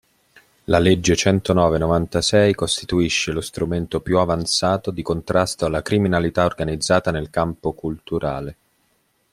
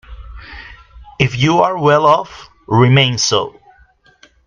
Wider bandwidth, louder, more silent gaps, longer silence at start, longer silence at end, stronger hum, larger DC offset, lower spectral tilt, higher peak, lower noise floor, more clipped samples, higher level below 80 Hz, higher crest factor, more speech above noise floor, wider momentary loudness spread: first, 15 kHz vs 9.4 kHz; second, -20 LUFS vs -13 LUFS; neither; first, 0.7 s vs 0.1 s; second, 0.8 s vs 0.95 s; neither; neither; about the same, -5 dB/octave vs -5 dB/octave; about the same, -2 dBFS vs 0 dBFS; first, -65 dBFS vs -50 dBFS; neither; about the same, -42 dBFS vs -40 dBFS; about the same, 18 dB vs 16 dB; first, 46 dB vs 38 dB; second, 9 LU vs 23 LU